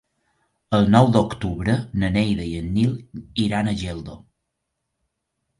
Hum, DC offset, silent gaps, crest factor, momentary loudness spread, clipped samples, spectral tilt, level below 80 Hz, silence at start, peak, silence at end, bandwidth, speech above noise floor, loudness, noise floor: none; under 0.1%; none; 22 dB; 15 LU; under 0.1%; -7 dB/octave; -42 dBFS; 0.7 s; -2 dBFS; 1.4 s; 11.5 kHz; 58 dB; -21 LUFS; -78 dBFS